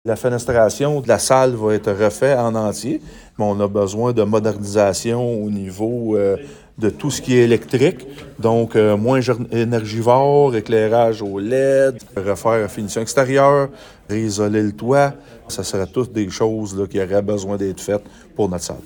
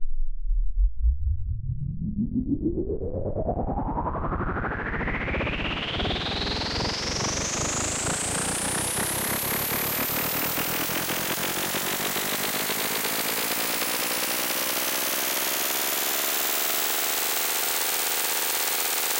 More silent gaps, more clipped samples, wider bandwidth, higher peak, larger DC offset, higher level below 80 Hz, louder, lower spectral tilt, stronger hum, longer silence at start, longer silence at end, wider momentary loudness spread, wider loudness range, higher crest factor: neither; neither; first, 19 kHz vs 16 kHz; first, -2 dBFS vs -12 dBFS; neither; second, -48 dBFS vs -34 dBFS; first, -18 LUFS vs -25 LUFS; first, -5.5 dB/octave vs -2.5 dB/octave; neither; about the same, 0.05 s vs 0 s; about the same, 0.05 s vs 0 s; about the same, 9 LU vs 7 LU; about the same, 4 LU vs 6 LU; about the same, 16 dB vs 14 dB